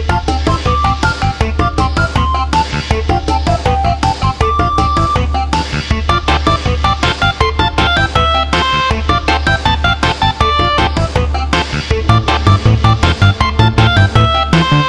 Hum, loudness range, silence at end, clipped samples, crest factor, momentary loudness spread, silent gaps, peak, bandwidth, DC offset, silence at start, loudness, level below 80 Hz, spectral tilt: none; 3 LU; 0 s; under 0.1%; 12 dB; 4 LU; none; 0 dBFS; 11 kHz; under 0.1%; 0 s; -13 LUFS; -20 dBFS; -5.5 dB/octave